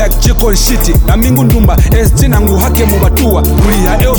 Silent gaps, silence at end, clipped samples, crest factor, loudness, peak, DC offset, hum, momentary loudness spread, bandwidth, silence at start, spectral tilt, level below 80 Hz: none; 0 s; under 0.1%; 8 dB; -9 LUFS; 0 dBFS; under 0.1%; none; 1 LU; over 20 kHz; 0 s; -5.5 dB/octave; -10 dBFS